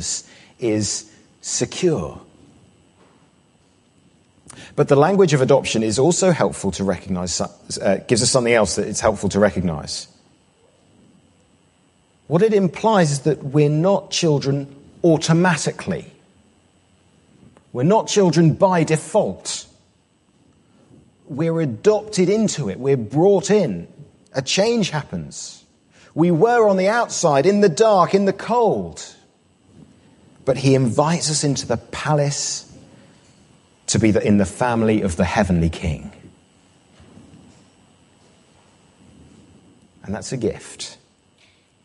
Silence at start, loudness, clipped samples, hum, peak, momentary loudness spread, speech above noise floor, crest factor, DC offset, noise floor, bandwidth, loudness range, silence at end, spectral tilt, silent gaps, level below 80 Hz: 0 s; -19 LUFS; under 0.1%; none; -2 dBFS; 14 LU; 41 dB; 18 dB; under 0.1%; -59 dBFS; 11.5 kHz; 8 LU; 0.9 s; -5 dB/octave; none; -44 dBFS